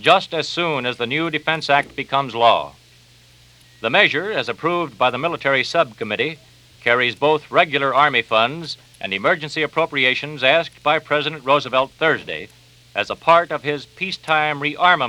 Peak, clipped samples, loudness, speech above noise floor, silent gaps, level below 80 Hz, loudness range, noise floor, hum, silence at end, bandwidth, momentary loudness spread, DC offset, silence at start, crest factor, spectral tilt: 0 dBFS; under 0.1%; -18 LUFS; 31 dB; none; -60 dBFS; 2 LU; -50 dBFS; none; 0 s; 12.5 kHz; 10 LU; under 0.1%; 0 s; 20 dB; -4.5 dB/octave